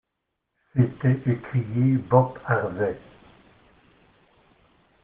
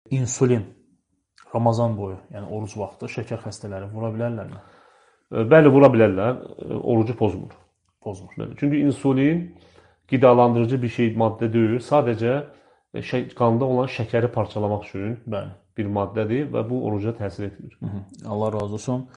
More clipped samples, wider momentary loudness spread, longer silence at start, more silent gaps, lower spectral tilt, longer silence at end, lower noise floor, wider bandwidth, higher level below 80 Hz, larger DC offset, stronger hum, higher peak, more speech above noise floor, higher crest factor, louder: neither; second, 8 LU vs 18 LU; first, 0.75 s vs 0.1 s; neither; first, -9 dB/octave vs -7.5 dB/octave; first, 2.05 s vs 0.1 s; first, -80 dBFS vs -66 dBFS; second, 3.6 kHz vs 10 kHz; about the same, -60 dBFS vs -58 dBFS; neither; neither; about the same, -2 dBFS vs 0 dBFS; first, 58 dB vs 44 dB; about the same, 24 dB vs 22 dB; about the same, -24 LUFS vs -22 LUFS